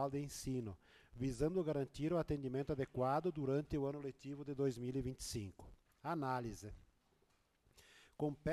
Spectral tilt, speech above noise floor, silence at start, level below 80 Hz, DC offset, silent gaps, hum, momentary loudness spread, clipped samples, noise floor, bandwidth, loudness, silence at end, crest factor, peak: -6.5 dB/octave; 36 dB; 0 s; -60 dBFS; under 0.1%; none; none; 12 LU; under 0.1%; -77 dBFS; 13 kHz; -42 LUFS; 0 s; 16 dB; -26 dBFS